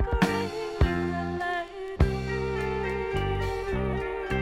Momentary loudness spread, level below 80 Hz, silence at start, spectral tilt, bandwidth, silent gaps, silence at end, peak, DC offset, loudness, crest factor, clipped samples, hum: 5 LU; -34 dBFS; 0 s; -6.5 dB/octave; 15 kHz; none; 0 s; -8 dBFS; under 0.1%; -29 LUFS; 20 dB; under 0.1%; none